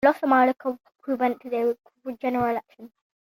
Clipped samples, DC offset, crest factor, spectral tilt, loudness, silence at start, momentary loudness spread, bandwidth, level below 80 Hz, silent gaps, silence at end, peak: under 0.1%; under 0.1%; 20 dB; -7 dB/octave; -25 LUFS; 0 s; 14 LU; 16.5 kHz; -66 dBFS; none; 0.4 s; -4 dBFS